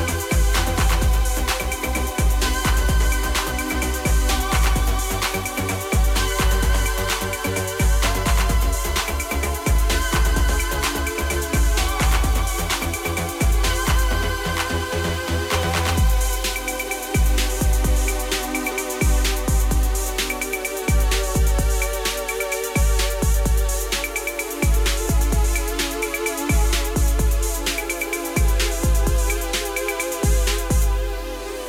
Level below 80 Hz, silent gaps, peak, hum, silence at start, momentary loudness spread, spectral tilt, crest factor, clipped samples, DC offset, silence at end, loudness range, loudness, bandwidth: -22 dBFS; none; -8 dBFS; none; 0 s; 4 LU; -4 dB/octave; 10 dB; under 0.1%; under 0.1%; 0 s; 1 LU; -21 LUFS; 16.5 kHz